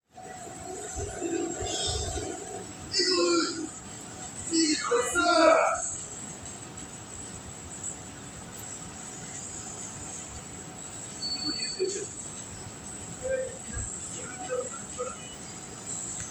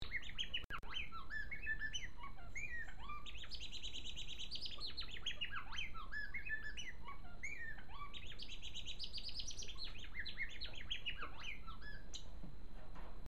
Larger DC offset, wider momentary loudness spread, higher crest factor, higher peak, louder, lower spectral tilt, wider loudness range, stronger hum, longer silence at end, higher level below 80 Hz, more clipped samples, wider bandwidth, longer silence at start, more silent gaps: second, under 0.1% vs 0.8%; first, 16 LU vs 10 LU; first, 24 dB vs 16 dB; first, -8 dBFS vs -30 dBFS; first, -31 LUFS vs -47 LUFS; about the same, -2.5 dB/octave vs -2 dB/octave; first, 12 LU vs 3 LU; neither; about the same, 0 s vs 0 s; about the same, -52 dBFS vs -54 dBFS; neither; first, over 20 kHz vs 13.5 kHz; first, 0.15 s vs 0 s; second, none vs 0.65-0.70 s